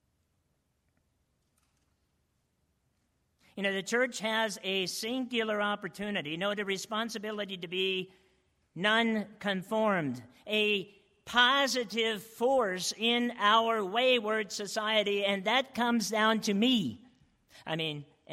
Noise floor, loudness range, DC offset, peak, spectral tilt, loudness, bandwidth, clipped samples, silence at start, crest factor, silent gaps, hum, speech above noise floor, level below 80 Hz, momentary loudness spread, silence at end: -76 dBFS; 6 LU; under 0.1%; -10 dBFS; -3.5 dB/octave; -30 LUFS; 16 kHz; under 0.1%; 3.55 s; 22 dB; none; none; 46 dB; -74 dBFS; 10 LU; 0 s